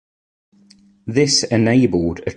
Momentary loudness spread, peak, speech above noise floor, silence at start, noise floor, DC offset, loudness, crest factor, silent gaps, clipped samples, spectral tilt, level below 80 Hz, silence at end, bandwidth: 8 LU; -2 dBFS; 35 dB; 1.05 s; -51 dBFS; under 0.1%; -16 LUFS; 16 dB; none; under 0.1%; -4.5 dB/octave; -44 dBFS; 0.05 s; 11.5 kHz